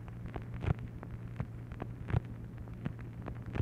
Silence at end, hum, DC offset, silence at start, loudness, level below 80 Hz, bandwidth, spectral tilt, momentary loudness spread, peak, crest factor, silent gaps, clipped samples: 0 s; none; under 0.1%; 0 s; -41 LUFS; -48 dBFS; 6.6 kHz; -9 dB/octave; 8 LU; -18 dBFS; 22 dB; none; under 0.1%